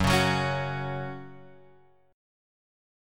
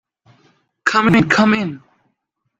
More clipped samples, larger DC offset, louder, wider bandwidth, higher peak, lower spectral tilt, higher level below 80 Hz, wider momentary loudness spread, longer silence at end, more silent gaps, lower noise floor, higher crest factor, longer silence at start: neither; neither; second, -28 LUFS vs -15 LUFS; first, 17.5 kHz vs 7.8 kHz; second, -12 dBFS vs 0 dBFS; about the same, -5 dB/octave vs -5.5 dB/octave; first, -48 dBFS vs -54 dBFS; first, 19 LU vs 9 LU; first, 1 s vs 0.8 s; neither; second, -60 dBFS vs -72 dBFS; about the same, 20 dB vs 18 dB; second, 0 s vs 0.85 s